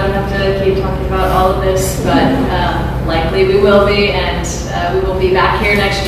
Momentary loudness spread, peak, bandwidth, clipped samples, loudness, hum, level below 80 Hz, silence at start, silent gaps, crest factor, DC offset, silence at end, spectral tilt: 7 LU; 0 dBFS; 15 kHz; under 0.1%; -13 LUFS; none; -22 dBFS; 0 s; none; 12 dB; under 0.1%; 0 s; -5.5 dB/octave